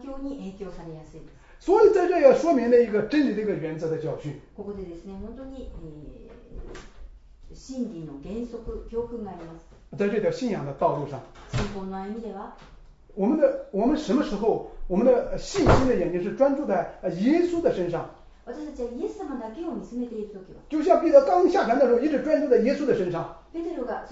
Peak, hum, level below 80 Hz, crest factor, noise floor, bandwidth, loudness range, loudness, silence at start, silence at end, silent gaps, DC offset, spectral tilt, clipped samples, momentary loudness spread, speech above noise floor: -4 dBFS; none; -44 dBFS; 20 dB; -45 dBFS; 8 kHz; 15 LU; -24 LUFS; 0 s; 0 s; none; under 0.1%; -7 dB/octave; under 0.1%; 21 LU; 20 dB